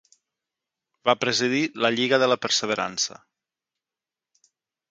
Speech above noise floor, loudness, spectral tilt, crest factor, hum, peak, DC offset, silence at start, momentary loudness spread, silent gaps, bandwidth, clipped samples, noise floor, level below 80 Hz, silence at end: 67 dB; -23 LUFS; -2.5 dB/octave; 24 dB; none; -4 dBFS; under 0.1%; 1.05 s; 6 LU; none; 9.6 kHz; under 0.1%; -90 dBFS; -72 dBFS; 1.8 s